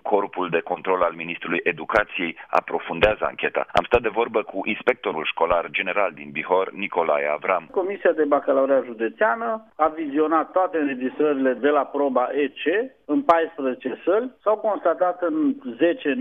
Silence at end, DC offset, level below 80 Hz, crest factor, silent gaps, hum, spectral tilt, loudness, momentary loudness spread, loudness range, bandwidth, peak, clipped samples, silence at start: 0 s; under 0.1%; -52 dBFS; 20 dB; none; none; -6.5 dB/octave; -23 LUFS; 6 LU; 1 LU; 7.2 kHz; -4 dBFS; under 0.1%; 0.05 s